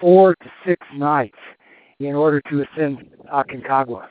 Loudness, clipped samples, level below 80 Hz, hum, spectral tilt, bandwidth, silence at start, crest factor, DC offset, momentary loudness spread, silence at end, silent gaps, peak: -19 LUFS; under 0.1%; -66 dBFS; none; -6.5 dB/octave; 4.6 kHz; 0 s; 18 dB; under 0.1%; 11 LU; 0.05 s; none; -2 dBFS